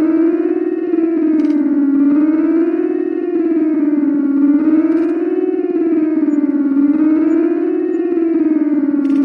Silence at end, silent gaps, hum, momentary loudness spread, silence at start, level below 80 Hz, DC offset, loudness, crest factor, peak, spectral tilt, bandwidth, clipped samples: 0 s; none; none; 4 LU; 0 s; -64 dBFS; under 0.1%; -14 LUFS; 10 dB; -4 dBFS; -9 dB/octave; 3.1 kHz; under 0.1%